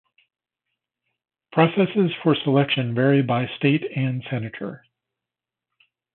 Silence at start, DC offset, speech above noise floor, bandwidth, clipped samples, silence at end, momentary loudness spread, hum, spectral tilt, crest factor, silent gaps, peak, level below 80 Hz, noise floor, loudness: 1.55 s; under 0.1%; 67 dB; 4.3 kHz; under 0.1%; 1.35 s; 10 LU; none; -11.5 dB/octave; 20 dB; none; -4 dBFS; -68 dBFS; -88 dBFS; -21 LUFS